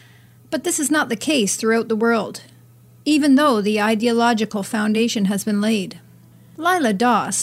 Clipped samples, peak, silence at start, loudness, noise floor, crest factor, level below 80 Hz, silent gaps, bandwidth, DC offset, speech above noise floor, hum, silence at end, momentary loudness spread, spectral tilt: under 0.1%; -4 dBFS; 0.5 s; -19 LUFS; -48 dBFS; 14 dB; -66 dBFS; none; 16 kHz; under 0.1%; 30 dB; none; 0 s; 8 LU; -4 dB/octave